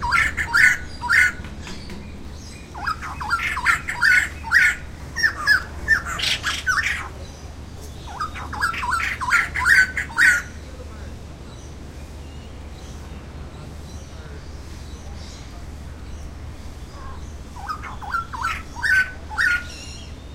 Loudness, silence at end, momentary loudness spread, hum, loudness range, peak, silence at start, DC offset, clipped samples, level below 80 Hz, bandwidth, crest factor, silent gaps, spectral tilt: -19 LUFS; 0 s; 22 LU; none; 18 LU; -2 dBFS; 0 s; under 0.1%; under 0.1%; -38 dBFS; 16 kHz; 22 dB; none; -2 dB/octave